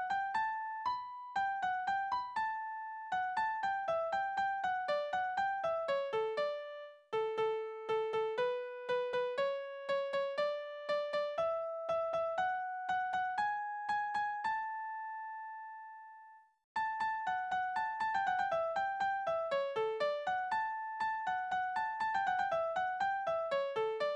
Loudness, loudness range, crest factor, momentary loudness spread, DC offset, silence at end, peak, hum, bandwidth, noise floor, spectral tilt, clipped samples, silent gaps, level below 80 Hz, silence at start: -36 LUFS; 3 LU; 14 dB; 7 LU; under 0.1%; 0 s; -24 dBFS; none; 9.2 kHz; -58 dBFS; -3 dB/octave; under 0.1%; 16.64-16.75 s; -76 dBFS; 0 s